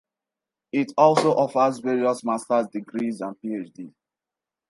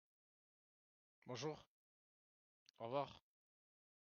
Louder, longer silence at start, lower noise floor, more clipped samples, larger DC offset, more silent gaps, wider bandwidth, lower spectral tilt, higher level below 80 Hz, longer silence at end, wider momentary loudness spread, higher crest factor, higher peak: first, -23 LUFS vs -49 LUFS; second, 0.75 s vs 1.25 s; about the same, -89 dBFS vs under -90 dBFS; neither; neither; second, none vs 1.67-2.74 s; first, 11.5 kHz vs 6.8 kHz; first, -6 dB/octave vs -4.5 dB/octave; first, -76 dBFS vs -88 dBFS; second, 0.8 s vs 1 s; second, 15 LU vs 18 LU; second, 20 dB vs 26 dB; first, -4 dBFS vs -30 dBFS